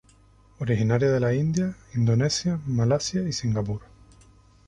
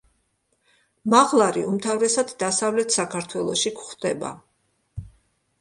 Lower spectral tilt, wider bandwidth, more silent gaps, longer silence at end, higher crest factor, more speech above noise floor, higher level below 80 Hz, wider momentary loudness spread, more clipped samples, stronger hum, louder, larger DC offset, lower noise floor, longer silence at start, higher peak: first, -6 dB/octave vs -3 dB/octave; about the same, 11 kHz vs 11.5 kHz; neither; first, 0.85 s vs 0.55 s; about the same, 18 dB vs 22 dB; second, 32 dB vs 48 dB; first, -50 dBFS vs -56 dBFS; second, 7 LU vs 17 LU; neither; neither; second, -25 LUFS vs -22 LUFS; neither; second, -56 dBFS vs -70 dBFS; second, 0.6 s vs 1.05 s; second, -8 dBFS vs -2 dBFS